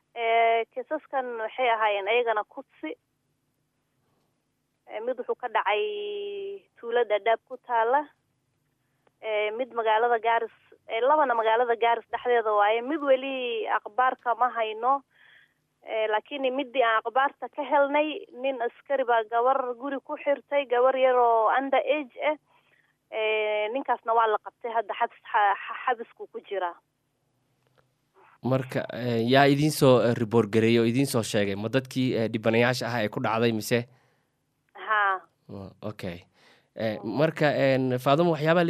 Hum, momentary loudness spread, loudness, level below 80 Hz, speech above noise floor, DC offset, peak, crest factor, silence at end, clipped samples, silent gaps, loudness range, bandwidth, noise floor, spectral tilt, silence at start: none; 13 LU; -26 LUFS; -72 dBFS; 50 dB; under 0.1%; -4 dBFS; 22 dB; 0 s; under 0.1%; none; 8 LU; 15.5 kHz; -76 dBFS; -5.5 dB/octave; 0.15 s